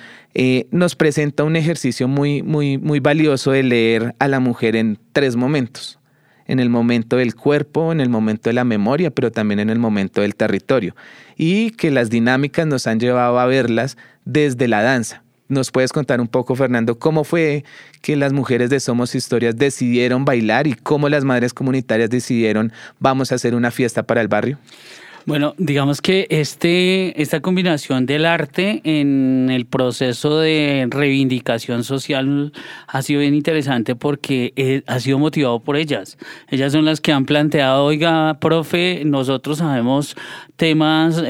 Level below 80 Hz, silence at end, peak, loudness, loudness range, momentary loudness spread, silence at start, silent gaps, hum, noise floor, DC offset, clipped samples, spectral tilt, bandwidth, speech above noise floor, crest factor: -62 dBFS; 0 s; 0 dBFS; -17 LUFS; 2 LU; 6 LU; 0 s; none; none; -54 dBFS; under 0.1%; under 0.1%; -6 dB/octave; 16 kHz; 37 dB; 16 dB